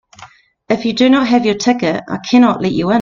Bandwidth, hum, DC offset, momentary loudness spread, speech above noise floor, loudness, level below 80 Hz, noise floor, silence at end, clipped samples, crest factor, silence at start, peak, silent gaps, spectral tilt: 7.4 kHz; none; under 0.1%; 7 LU; 29 dB; -14 LUFS; -50 dBFS; -42 dBFS; 0 s; under 0.1%; 14 dB; 0.2 s; 0 dBFS; none; -5.5 dB/octave